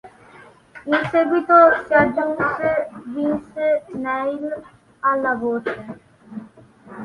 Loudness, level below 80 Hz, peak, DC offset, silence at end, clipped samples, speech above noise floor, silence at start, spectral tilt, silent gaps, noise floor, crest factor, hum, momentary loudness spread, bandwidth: -19 LUFS; -56 dBFS; -2 dBFS; under 0.1%; 0 s; under 0.1%; 28 dB; 0.05 s; -7.5 dB/octave; none; -47 dBFS; 18 dB; none; 21 LU; 10.5 kHz